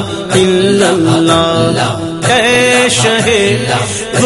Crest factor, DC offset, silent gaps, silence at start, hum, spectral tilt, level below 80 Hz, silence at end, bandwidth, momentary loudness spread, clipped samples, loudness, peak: 10 dB; under 0.1%; none; 0 s; none; -4 dB/octave; -40 dBFS; 0 s; 12 kHz; 6 LU; 0.1%; -10 LUFS; 0 dBFS